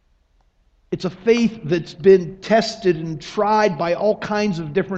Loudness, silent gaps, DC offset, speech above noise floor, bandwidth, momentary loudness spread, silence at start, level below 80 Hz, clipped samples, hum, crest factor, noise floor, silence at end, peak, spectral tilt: -19 LUFS; none; under 0.1%; 41 dB; 8 kHz; 11 LU; 0.9 s; -52 dBFS; under 0.1%; none; 18 dB; -60 dBFS; 0 s; -2 dBFS; -6 dB/octave